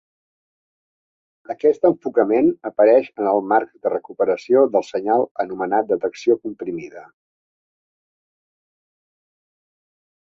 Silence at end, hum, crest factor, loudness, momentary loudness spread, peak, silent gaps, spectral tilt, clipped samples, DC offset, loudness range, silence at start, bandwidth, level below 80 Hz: 3.35 s; none; 18 dB; -19 LUFS; 10 LU; -2 dBFS; 5.31-5.35 s; -7 dB/octave; under 0.1%; under 0.1%; 9 LU; 1.5 s; 7.6 kHz; -68 dBFS